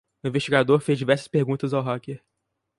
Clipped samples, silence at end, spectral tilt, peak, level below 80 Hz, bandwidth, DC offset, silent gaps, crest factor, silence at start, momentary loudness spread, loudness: under 0.1%; 0.6 s; -6.5 dB/octave; -4 dBFS; -64 dBFS; 11.5 kHz; under 0.1%; none; 20 dB; 0.25 s; 12 LU; -23 LUFS